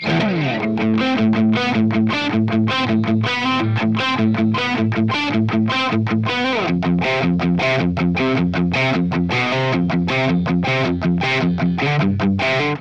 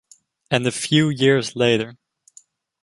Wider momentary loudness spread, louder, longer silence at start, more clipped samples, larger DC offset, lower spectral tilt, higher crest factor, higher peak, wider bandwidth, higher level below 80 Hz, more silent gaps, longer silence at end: second, 2 LU vs 6 LU; about the same, -18 LUFS vs -19 LUFS; second, 0 s vs 0.5 s; neither; first, 0.3% vs under 0.1%; first, -7 dB/octave vs -5 dB/octave; second, 12 dB vs 20 dB; second, -6 dBFS vs -2 dBFS; second, 8 kHz vs 11.5 kHz; first, -46 dBFS vs -58 dBFS; neither; second, 0 s vs 0.9 s